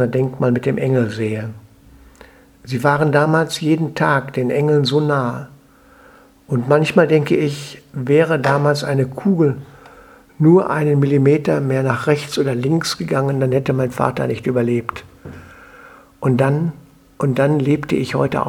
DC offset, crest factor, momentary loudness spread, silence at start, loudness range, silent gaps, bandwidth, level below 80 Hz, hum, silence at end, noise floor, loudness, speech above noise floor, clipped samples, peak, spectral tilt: under 0.1%; 18 dB; 9 LU; 0 s; 4 LU; none; 14.5 kHz; -52 dBFS; none; 0 s; -48 dBFS; -17 LUFS; 31 dB; under 0.1%; 0 dBFS; -7 dB/octave